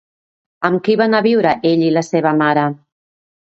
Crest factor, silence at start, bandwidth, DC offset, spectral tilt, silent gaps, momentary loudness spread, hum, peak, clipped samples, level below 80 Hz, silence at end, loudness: 16 dB; 0.6 s; 8 kHz; under 0.1%; -6.5 dB/octave; none; 7 LU; none; 0 dBFS; under 0.1%; -62 dBFS; 0.7 s; -15 LUFS